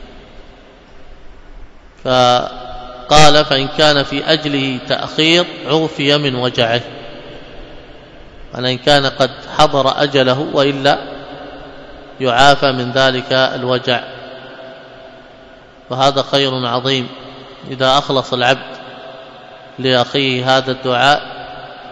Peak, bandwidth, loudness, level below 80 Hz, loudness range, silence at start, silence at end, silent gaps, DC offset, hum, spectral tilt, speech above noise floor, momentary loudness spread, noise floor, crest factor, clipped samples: 0 dBFS; 11 kHz; -14 LUFS; -40 dBFS; 6 LU; 0 s; 0 s; none; under 0.1%; none; -4 dB/octave; 27 dB; 21 LU; -40 dBFS; 16 dB; 0.3%